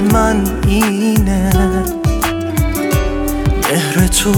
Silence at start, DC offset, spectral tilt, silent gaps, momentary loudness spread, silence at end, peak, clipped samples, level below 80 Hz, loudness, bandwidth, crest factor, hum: 0 s; under 0.1%; -5 dB/octave; none; 5 LU; 0 s; 0 dBFS; under 0.1%; -20 dBFS; -14 LUFS; 19.5 kHz; 14 dB; none